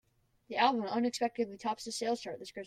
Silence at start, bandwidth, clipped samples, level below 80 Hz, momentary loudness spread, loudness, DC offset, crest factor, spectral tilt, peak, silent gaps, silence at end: 0.5 s; 14.5 kHz; under 0.1%; -74 dBFS; 9 LU; -34 LUFS; under 0.1%; 22 dB; -3.5 dB/octave; -14 dBFS; none; 0 s